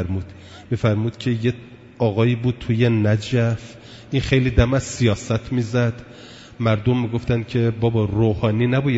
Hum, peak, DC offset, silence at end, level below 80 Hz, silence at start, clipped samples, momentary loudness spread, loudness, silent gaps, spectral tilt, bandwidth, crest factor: none; -2 dBFS; under 0.1%; 0 s; -38 dBFS; 0 s; under 0.1%; 15 LU; -21 LUFS; none; -7 dB/octave; 8 kHz; 18 dB